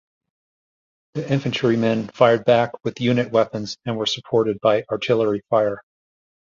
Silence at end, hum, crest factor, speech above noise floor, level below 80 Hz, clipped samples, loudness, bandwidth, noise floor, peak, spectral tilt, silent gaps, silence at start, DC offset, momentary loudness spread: 0.7 s; none; 20 dB; over 70 dB; -60 dBFS; under 0.1%; -20 LUFS; 7.6 kHz; under -90 dBFS; -2 dBFS; -6 dB/octave; none; 1.15 s; under 0.1%; 8 LU